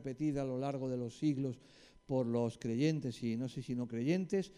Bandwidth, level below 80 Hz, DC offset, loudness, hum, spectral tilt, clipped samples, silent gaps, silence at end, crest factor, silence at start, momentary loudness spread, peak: 11.5 kHz; -66 dBFS; under 0.1%; -37 LUFS; none; -7.5 dB/octave; under 0.1%; none; 0.05 s; 16 dB; 0 s; 6 LU; -22 dBFS